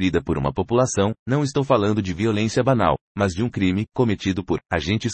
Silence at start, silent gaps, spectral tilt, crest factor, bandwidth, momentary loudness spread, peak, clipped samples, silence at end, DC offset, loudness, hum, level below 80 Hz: 0 s; 1.19-1.26 s, 3.01-3.15 s; -6 dB/octave; 18 dB; 8.8 kHz; 5 LU; -4 dBFS; under 0.1%; 0 s; under 0.1%; -22 LUFS; none; -46 dBFS